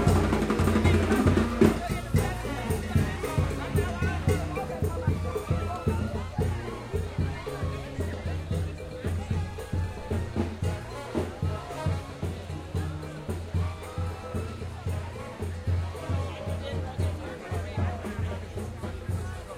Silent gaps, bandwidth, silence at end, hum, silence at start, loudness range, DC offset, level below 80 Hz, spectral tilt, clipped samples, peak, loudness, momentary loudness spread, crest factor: none; 15.5 kHz; 0 s; none; 0 s; 8 LU; under 0.1%; -40 dBFS; -7 dB/octave; under 0.1%; -6 dBFS; -30 LUFS; 12 LU; 22 dB